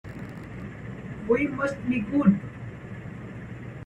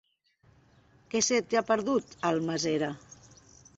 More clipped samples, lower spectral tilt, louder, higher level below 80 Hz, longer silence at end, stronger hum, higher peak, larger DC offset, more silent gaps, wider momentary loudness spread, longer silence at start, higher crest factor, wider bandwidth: neither; first, -8.5 dB/octave vs -3.5 dB/octave; first, -26 LUFS vs -29 LUFS; first, -52 dBFS vs -68 dBFS; second, 0 s vs 0.8 s; neither; first, -8 dBFS vs -12 dBFS; neither; neither; first, 17 LU vs 8 LU; second, 0.05 s vs 1.15 s; about the same, 20 dB vs 18 dB; first, 9.6 kHz vs 8.2 kHz